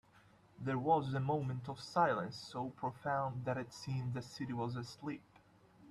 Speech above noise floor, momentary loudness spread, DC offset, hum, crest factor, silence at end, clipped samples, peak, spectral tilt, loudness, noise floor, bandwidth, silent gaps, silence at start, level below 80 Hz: 28 dB; 11 LU; under 0.1%; none; 22 dB; 0 s; under 0.1%; -18 dBFS; -6.5 dB/octave; -39 LUFS; -66 dBFS; 12 kHz; none; 0.15 s; -72 dBFS